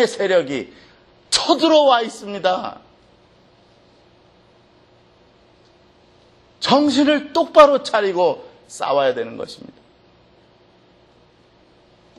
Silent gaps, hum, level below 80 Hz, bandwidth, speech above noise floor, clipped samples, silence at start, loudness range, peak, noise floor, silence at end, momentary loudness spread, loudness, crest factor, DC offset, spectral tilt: none; none; -60 dBFS; 11.5 kHz; 36 dB; under 0.1%; 0 s; 12 LU; 0 dBFS; -53 dBFS; 2.65 s; 19 LU; -17 LUFS; 20 dB; under 0.1%; -3.5 dB/octave